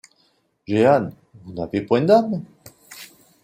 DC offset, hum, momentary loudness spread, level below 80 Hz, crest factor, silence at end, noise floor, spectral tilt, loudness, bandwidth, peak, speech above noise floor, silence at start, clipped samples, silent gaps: under 0.1%; none; 24 LU; -60 dBFS; 18 dB; 0.4 s; -64 dBFS; -7 dB/octave; -19 LUFS; 16 kHz; -4 dBFS; 45 dB; 0.7 s; under 0.1%; none